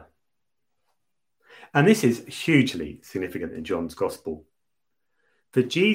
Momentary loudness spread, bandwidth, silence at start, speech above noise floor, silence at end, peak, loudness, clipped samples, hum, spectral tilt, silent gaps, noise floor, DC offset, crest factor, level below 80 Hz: 15 LU; 16 kHz; 1.6 s; 61 dB; 0 s; -4 dBFS; -24 LUFS; under 0.1%; none; -5.5 dB/octave; none; -84 dBFS; under 0.1%; 22 dB; -58 dBFS